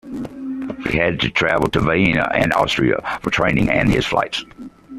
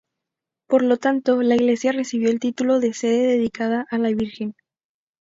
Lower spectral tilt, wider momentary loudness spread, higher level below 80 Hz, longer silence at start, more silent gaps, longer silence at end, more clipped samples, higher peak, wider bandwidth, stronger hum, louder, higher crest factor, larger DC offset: about the same, -5.5 dB/octave vs -5 dB/octave; first, 12 LU vs 6 LU; first, -38 dBFS vs -60 dBFS; second, 0.05 s vs 0.7 s; neither; second, 0 s vs 0.7 s; neither; about the same, -2 dBFS vs -4 dBFS; first, 14 kHz vs 7.8 kHz; neither; about the same, -18 LUFS vs -20 LUFS; about the same, 16 dB vs 16 dB; neither